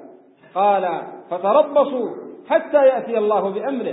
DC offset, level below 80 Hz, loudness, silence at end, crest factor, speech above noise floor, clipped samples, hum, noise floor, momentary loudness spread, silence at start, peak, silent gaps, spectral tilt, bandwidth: under 0.1%; -78 dBFS; -19 LUFS; 0 s; 16 dB; 28 dB; under 0.1%; none; -46 dBFS; 13 LU; 0 s; -2 dBFS; none; -10.5 dB/octave; 4 kHz